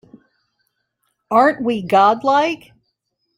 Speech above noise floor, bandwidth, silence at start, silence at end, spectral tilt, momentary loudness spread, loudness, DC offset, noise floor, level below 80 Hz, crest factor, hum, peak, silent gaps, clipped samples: 57 dB; 16 kHz; 1.3 s; 0.8 s; -5.5 dB/octave; 8 LU; -16 LUFS; under 0.1%; -72 dBFS; -62 dBFS; 18 dB; none; -2 dBFS; none; under 0.1%